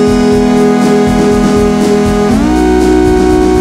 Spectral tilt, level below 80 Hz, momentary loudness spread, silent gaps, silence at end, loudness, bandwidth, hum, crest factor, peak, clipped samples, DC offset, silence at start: -6.5 dB/octave; -20 dBFS; 1 LU; none; 0 s; -8 LUFS; 15 kHz; none; 8 dB; 0 dBFS; under 0.1%; under 0.1%; 0 s